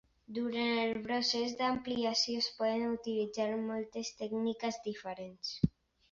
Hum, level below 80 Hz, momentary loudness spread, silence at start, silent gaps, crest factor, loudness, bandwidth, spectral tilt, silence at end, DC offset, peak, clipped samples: none; -62 dBFS; 10 LU; 0.3 s; none; 22 dB; -35 LUFS; 7.4 kHz; -3.5 dB/octave; 0.45 s; under 0.1%; -14 dBFS; under 0.1%